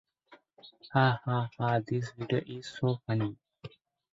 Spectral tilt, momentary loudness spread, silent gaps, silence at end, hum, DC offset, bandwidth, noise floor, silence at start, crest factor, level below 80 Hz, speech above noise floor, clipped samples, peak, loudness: -7.5 dB/octave; 23 LU; none; 0.45 s; none; under 0.1%; 7.8 kHz; -61 dBFS; 0.3 s; 22 dB; -66 dBFS; 31 dB; under 0.1%; -10 dBFS; -31 LUFS